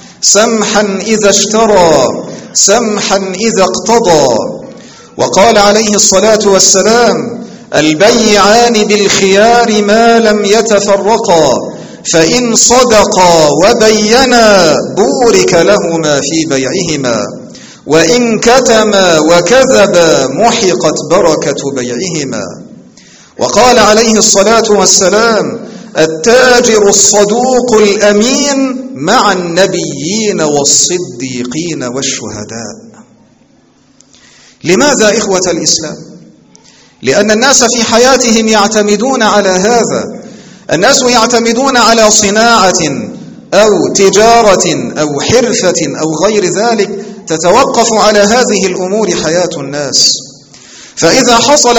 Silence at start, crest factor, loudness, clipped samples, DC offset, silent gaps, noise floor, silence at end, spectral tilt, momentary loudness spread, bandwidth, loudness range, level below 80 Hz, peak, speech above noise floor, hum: 0.05 s; 8 dB; -7 LUFS; 2%; under 0.1%; none; -46 dBFS; 0 s; -2.5 dB/octave; 11 LU; over 20 kHz; 5 LU; -40 dBFS; 0 dBFS; 38 dB; none